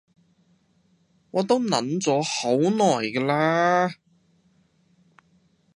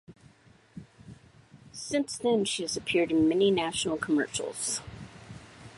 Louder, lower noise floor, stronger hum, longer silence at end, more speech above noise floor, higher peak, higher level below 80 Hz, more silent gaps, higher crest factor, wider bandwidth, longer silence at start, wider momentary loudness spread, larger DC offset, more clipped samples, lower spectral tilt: first, -22 LUFS vs -28 LUFS; first, -64 dBFS vs -59 dBFS; neither; first, 1.8 s vs 0 s; first, 42 dB vs 31 dB; first, -4 dBFS vs -14 dBFS; second, -72 dBFS vs -60 dBFS; neither; about the same, 20 dB vs 16 dB; about the same, 11.5 kHz vs 11.5 kHz; first, 1.35 s vs 0.1 s; second, 5 LU vs 23 LU; neither; neither; about the same, -4.5 dB/octave vs -3.5 dB/octave